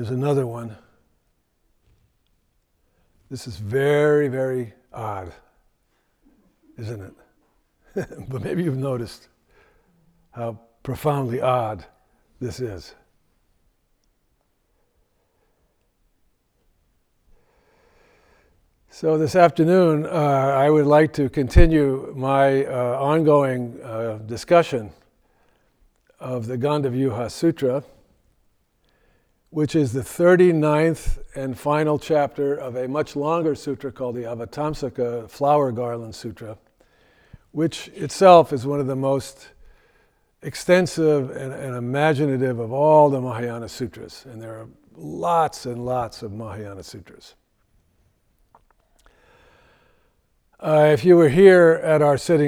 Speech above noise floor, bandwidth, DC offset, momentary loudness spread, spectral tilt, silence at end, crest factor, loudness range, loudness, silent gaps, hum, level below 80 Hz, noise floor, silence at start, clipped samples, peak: 48 dB; 15.5 kHz; under 0.1%; 19 LU; -7 dB/octave; 0 s; 22 dB; 14 LU; -20 LUFS; none; none; -36 dBFS; -67 dBFS; 0 s; under 0.1%; 0 dBFS